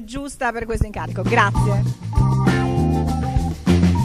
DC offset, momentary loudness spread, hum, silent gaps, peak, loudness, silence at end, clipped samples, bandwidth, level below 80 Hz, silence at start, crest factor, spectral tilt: under 0.1%; 8 LU; none; none; 0 dBFS; -20 LUFS; 0 s; under 0.1%; 13 kHz; -28 dBFS; 0 s; 18 dB; -7 dB/octave